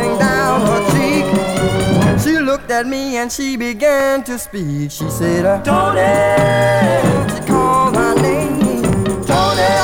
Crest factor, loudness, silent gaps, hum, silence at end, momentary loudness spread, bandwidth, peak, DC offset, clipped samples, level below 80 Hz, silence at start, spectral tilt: 12 dB; -15 LUFS; none; none; 0 s; 7 LU; 19 kHz; -2 dBFS; under 0.1%; under 0.1%; -36 dBFS; 0 s; -5.5 dB/octave